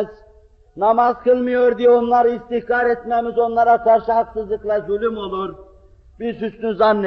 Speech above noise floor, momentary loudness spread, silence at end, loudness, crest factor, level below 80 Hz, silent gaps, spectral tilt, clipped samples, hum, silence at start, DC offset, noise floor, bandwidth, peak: 32 dB; 11 LU; 0 s; -18 LUFS; 14 dB; -48 dBFS; none; -4 dB/octave; under 0.1%; none; 0 s; under 0.1%; -49 dBFS; 5.8 kHz; -4 dBFS